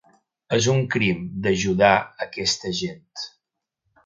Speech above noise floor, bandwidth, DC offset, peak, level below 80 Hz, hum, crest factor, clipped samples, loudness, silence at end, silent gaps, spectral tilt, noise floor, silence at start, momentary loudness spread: 59 dB; 9.4 kHz; under 0.1%; 0 dBFS; -52 dBFS; none; 22 dB; under 0.1%; -22 LUFS; 0.75 s; none; -4.5 dB/octave; -81 dBFS; 0.5 s; 17 LU